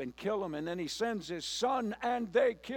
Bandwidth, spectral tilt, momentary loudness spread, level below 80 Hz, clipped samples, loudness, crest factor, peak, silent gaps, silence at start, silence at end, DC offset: 17 kHz; -4 dB/octave; 7 LU; -66 dBFS; under 0.1%; -34 LUFS; 18 dB; -16 dBFS; none; 0 s; 0 s; under 0.1%